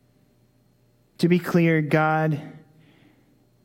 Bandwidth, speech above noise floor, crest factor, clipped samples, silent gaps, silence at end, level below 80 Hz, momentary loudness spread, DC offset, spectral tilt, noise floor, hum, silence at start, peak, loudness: 16.5 kHz; 41 dB; 18 dB; under 0.1%; none; 1.05 s; -66 dBFS; 9 LU; under 0.1%; -7.5 dB/octave; -62 dBFS; none; 1.2 s; -8 dBFS; -22 LUFS